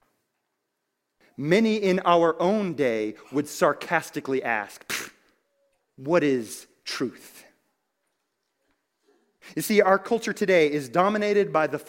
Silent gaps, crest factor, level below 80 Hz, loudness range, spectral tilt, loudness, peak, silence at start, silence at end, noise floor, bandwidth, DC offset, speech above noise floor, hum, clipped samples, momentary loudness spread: none; 22 dB; -68 dBFS; 7 LU; -5 dB/octave; -24 LUFS; -4 dBFS; 1.4 s; 0.05 s; -80 dBFS; 16.5 kHz; under 0.1%; 56 dB; none; under 0.1%; 12 LU